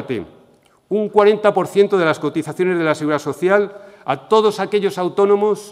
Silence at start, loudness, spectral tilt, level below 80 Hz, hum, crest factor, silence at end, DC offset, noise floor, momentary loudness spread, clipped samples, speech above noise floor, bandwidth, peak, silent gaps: 0 s; -17 LUFS; -6 dB/octave; -64 dBFS; none; 18 dB; 0 s; under 0.1%; -53 dBFS; 11 LU; under 0.1%; 36 dB; 13.5 kHz; 0 dBFS; none